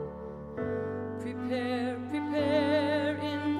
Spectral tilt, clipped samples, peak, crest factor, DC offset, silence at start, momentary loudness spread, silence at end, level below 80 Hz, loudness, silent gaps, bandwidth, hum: -7 dB/octave; under 0.1%; -14 dBFS; 16 dB; under 0.1%; 0 s; 10 LU; 0 s; -60 dBFS; -31 LUFS; none; 11 kHz; none